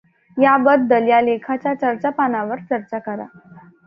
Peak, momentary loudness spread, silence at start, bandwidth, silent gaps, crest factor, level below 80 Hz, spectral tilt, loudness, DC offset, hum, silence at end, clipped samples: -2 dBFS; 15 LU; 0.35 s; 5.2 kHz; none; 16 dB; -66 dBFS; -8.5 dB/octave; -18 LUFS; under 0.1%; none; 0.3 s; under 0.1%